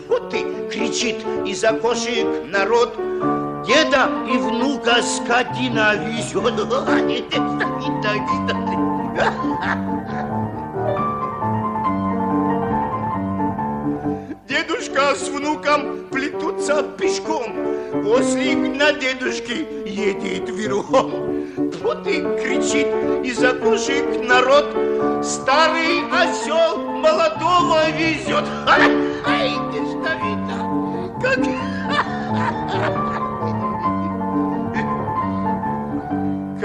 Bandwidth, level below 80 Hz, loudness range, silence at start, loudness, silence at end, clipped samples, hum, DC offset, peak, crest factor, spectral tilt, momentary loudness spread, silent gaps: 10.5 kHz; -50 dBFS; 5 LU; 0 s; -20 LUFS; 0 s; under 0.1%; none; under 0.1%; 0 dBFS; 18 dB; -4.5 dB/octave; 8 LU; none